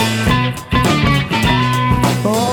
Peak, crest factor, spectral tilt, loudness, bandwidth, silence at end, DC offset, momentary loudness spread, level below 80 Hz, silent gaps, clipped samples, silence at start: 0 dBFS; 14 dB; -5 dB/octave; -14 LUFS; 18.5 kHz; 0 s; under 0.1%; 3 LU; -28 dBFS; none; under 0.1%; 0 s